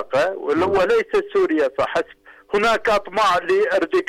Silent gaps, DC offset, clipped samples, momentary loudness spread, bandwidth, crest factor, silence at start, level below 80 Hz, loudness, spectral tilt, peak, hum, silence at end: none; under 0.1%; under 0.1%; 5 LU; 14 kHz; 8 dB; 0 s; -50 dBFS; -19 LUFS; -4.5 dB/octave; -12 dBFS; none; 0.05 s